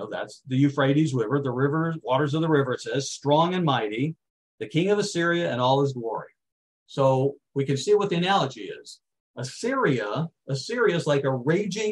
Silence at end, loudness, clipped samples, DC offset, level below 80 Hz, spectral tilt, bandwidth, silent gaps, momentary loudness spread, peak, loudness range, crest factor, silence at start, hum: 0 s; -24 LUFS; under 0.1%; under 0.1%; -70 dBFS; -6 dB/octave; 11.5 kHz; 4.30-4.58 s, 6.52-6.86 s, 9.20-9.34 s; 10 LU; -8 dBFS; 2 LU; 18 dB; 0 s; none